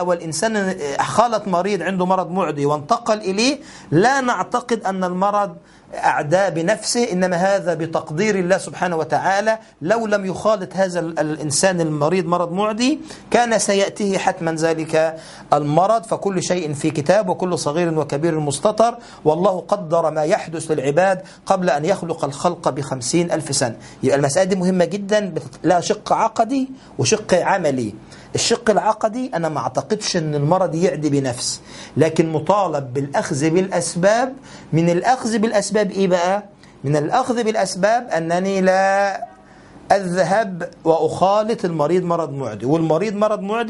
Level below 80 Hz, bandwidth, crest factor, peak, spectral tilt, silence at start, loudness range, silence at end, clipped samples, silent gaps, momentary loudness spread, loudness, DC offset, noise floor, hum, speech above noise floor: -56 dBFS; 11.5 kHz; 18 dB; 0 dBFS; -5 dB/octave; 0 s; 1 LU; 0 s; under 0.1%; none; 6 LU; -19 LUFS; under 0.1%; -44 dBFS; none; 25 dB